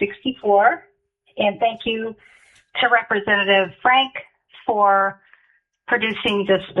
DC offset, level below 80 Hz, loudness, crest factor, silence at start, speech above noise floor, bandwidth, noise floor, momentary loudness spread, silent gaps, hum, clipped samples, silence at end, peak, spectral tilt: under 0.1%; -60 dBFS; -19 LUFS; 18 dB; 0 s; 43 dB; 10.5 kHz; -62 dBFS; 13 LU; none; none; under 0.1%; 0 s; -2 dBFS; -6 dB/octave